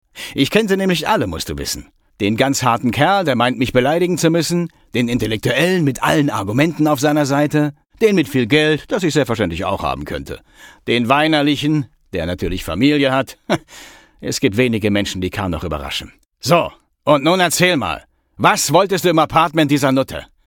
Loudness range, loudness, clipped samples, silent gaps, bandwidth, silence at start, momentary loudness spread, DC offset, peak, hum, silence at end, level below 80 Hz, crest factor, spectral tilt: 4 LU; -17 LUFS; under 0.1%; none; 18.5 kHz; 0.15 s; 10 LU; under 0.1%; 0 dBFS; none; 0.2 s; -40 dBFS; 16 dB; -5 dB/octave